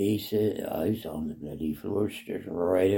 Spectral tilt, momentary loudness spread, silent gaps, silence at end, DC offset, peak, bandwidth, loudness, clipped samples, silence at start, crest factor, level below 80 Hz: -7 dB/octave; 8 LU; none; 0 s; under 0.1%; -12 dBFS; 17 kHz; -30 LUFS; under 0.1%; 0 s; 16 dB; -56 dBFS